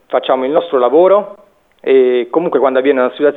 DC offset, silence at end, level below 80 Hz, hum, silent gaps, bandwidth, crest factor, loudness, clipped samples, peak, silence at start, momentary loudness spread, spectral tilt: under 0.1%; 0 s; -66 dBFS; none; none; 4.1 kHz; 12 dB; -12 LUFS; under 0.1%; 0 dBFS; 0.1 s; 5 LU; -8 dB/octave